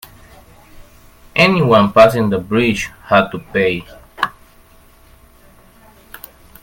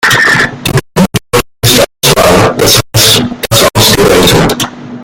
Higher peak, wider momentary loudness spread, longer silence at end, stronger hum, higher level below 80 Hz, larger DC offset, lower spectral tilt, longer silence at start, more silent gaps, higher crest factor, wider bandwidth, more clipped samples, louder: about the same, 0 dBFS vs 0 dBFS; first, 14 LU vs 7 LU; first, 2.35 s vs 0 s; neither; second, -44 dBFS vs -28 dBFS; neither; first, -6 dB/octave vs -3 dB/octave; first, 0.75 s vs 0 s; neither; first, 18 dB vs 8 dB; second, 17 kHz vs over 20 kHz; second, under 0.1% vs 1%; second, -14 LUFS vs -7 LUFS